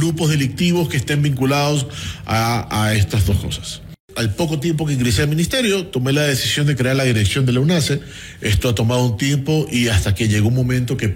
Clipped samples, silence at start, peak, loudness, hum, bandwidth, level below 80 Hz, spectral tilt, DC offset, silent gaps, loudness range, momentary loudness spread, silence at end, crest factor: under 0.1%; 0 s; -4 dBFS; -18 LUFS; none; 16.5 kHz; -36 dBFS; -5 dB/octave; under 0.1%; 4.00-4.08 s; 2 LU; 6 LU; 0 s; 14 dB